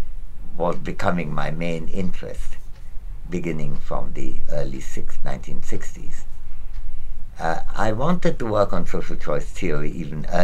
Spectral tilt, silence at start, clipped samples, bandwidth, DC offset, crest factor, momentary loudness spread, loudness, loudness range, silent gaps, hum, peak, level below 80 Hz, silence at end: -6.5 dB/octave; 0 s; under 0.1%; 7.6 kHz; 1%; 14 dB; 17 LU; -27 LUFS; 8 LU; none; none; -2 dBFS; -26 dBFS; 0 s